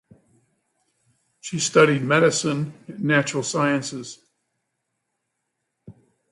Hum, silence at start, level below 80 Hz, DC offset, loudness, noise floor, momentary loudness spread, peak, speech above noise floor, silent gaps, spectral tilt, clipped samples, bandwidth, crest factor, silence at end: none; 1.45 s; -68 dBFS; under 0.1%; -21 LUFS; -78 dBFS; 16 LU; -2 dBFS; 57 dB; none; -4.5 dB/octave; under 0.1%; 11.5 kHz; 22 dB; 0.4 s